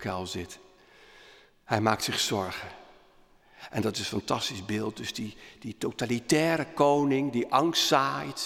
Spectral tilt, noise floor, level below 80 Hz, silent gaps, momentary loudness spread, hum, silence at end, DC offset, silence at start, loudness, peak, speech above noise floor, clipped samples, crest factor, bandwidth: -4 dB/octave; -59 dBFS; -64 dBFS; none; 16 LU; none; 0 s; under 0.1%; 0 s; -28 LUFS; -6 dBFS; 31 dB; under 0.1%; 24 dB; 17 kHz